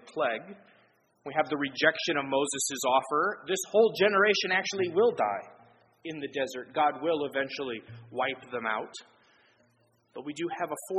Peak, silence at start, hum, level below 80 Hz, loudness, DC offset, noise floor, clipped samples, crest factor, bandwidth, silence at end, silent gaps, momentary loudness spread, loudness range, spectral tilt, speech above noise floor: -8 dBFS; 0.05 s; none; -78 dBFS; -29 LUFS; under 0.1%; -68 dBFS; under 0.1%; 22 dB; 9.4 kHz; 0 s; none; 17 LU; 9 LU; -3 dB/octave; 39 dB